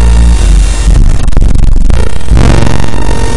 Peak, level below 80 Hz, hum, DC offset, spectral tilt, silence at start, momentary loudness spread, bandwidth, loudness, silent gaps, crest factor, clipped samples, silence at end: 0 dBFS; -6 dBFS; none; under 0.1%; -6 dB/octave; 0 s; 6 LU; 11.5 kHz; -9 LUFS; none; 6 dB; 7%; 0 s